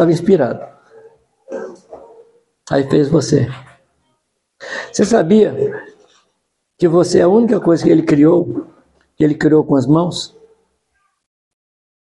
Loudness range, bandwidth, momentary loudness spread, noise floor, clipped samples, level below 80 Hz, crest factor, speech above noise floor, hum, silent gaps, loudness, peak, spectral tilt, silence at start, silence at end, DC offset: 6 LU; 11.5 kHz; 18 LU; -69 dBFS; under 0.1%; -52 dBFS; 16 dB; 56 dB; none; none; -14 LUFS; 0 dBFS; -6.5 dB/octave; 0 s; 1.8 s; under 0.1%